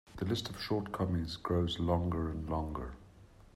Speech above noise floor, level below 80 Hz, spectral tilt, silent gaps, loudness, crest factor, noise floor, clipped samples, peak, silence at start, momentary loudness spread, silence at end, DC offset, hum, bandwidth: 23 dB; -50 dBFS; -6.5 dB/octave; none; -36 LUFS; 16 dB; -58 dBFS; under 0.1%; -18 dBFS; 0.05 s; 9 LU; 0.15 s; under 0.1%; none; 14 kHz